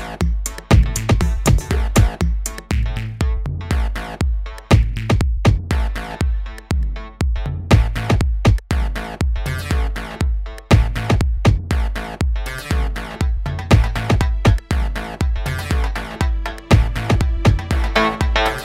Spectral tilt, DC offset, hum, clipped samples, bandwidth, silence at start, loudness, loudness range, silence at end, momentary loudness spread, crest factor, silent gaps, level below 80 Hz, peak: -6 dB/octave; under 0.1%; none; under 0.1%; 15.5 kHz; 0 s; -19 LUFS; 1 LU; 0 s; 9 LU; 16 dB; none; -20 dBFS; 0 dBFS